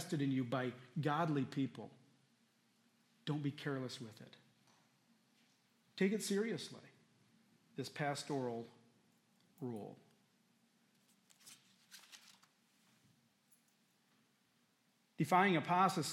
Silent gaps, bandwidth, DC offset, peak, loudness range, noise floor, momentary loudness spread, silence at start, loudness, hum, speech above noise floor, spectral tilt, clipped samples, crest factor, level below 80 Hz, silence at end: none; 16 kHz; under 0.1%; -18 dBFS; 22 LU; -77 dBFS; 26 LU; 0 s; -39 LUFS; none; 39 dB; -5.5 dB/octave; under 0.1%; 24 dB; under -90 dBFS; 0 s